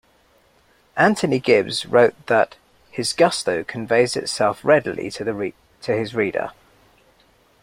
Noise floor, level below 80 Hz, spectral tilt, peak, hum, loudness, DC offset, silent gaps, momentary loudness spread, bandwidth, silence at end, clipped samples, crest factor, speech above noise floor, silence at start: -58 dBFS; -58 dBFS; -4.5 dB/octave; 0 dBFS; none; -20 LUFS; under 0.1%; none; 11 LU; 16 kHz; 1.1 s; under 0.1%; 20 dB; 39 dB; 0.95 s